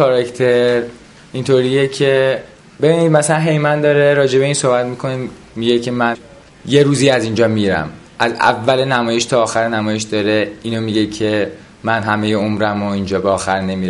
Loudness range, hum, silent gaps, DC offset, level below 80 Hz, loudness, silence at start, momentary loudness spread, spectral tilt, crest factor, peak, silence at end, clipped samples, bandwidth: 4 LU; none; none; under 0.1%; -46 dBFS; -15 LUFS; 0 s; 9 LU; -5 dB/octave; 14 dB; 0 dBFS; 0 s; under 0.1%; 11.5 kHz